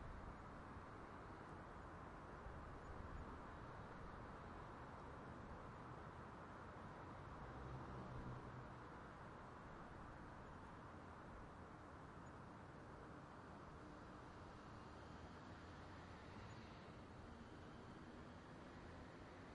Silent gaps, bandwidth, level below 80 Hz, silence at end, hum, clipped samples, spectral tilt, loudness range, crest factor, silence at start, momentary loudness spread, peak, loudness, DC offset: none; 10.5 kHz; -66 dBFS; 0 s; none; under 0.1%; -6.5 dB/octave; 3 LU; 14 dB; 0 s; 4 LU; -42 dBFS; -58 LUFS; under 0.1%